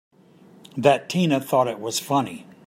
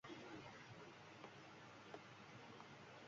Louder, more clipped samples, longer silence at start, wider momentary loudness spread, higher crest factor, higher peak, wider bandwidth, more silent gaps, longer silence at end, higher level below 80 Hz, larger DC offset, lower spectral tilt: first, -22 LUFS vs -59 LUFS; neither; first, 0.75 s vs 0.05 s; first, 8 LU vs 4 LU; about the same, 22 dB vs 20 dB; first, -2 dBFS vs -40 dBFS; first, 16 kHz vs 7.4 kHz; neither; first, 0.25 s vs 0 s; first, -70 dBFS vs -86 dBFS; neither; first, -5 dB/octave vs -3.5 dB/octave